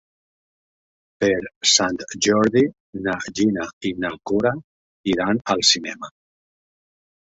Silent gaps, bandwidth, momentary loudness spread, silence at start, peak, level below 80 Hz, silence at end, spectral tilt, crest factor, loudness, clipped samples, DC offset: 1.56-1.61 s, 2.80-2.93 s, 3.73-3.81 s, 4.64-5.04 s; 8.2 kHz; 12 LU; 1.2 s; 0 dBFS; -56 dBFS; 1.3 s; -3 dB/octave; 22 dB; -20 LUFS; under 0.1%; under 0.1%